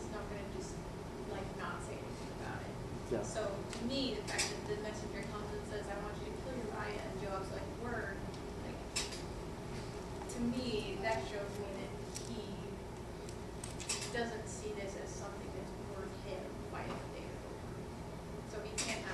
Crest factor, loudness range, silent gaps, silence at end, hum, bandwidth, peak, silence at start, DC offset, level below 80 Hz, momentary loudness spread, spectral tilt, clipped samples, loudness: 20 dB; 4 LU; none; 0 s; none; 14 kHz; -22 dBFS; 0 s; under 0.1%; -54 dBFS; 8 LU; -4 dB/octave; under 0.1%; -42 LUFS